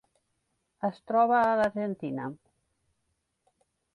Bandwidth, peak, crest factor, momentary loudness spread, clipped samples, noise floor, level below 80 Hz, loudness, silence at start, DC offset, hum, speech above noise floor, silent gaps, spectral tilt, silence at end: 10.5 kHz; -12 dBFS; 18 dB; 13 LU; under 0.1%; -78 dBFS; -70 dBFS; -28 LUFS; 0.85 s; under 0.1%; none; 51 dB; none; -7.5 dB/octave; 1.6 s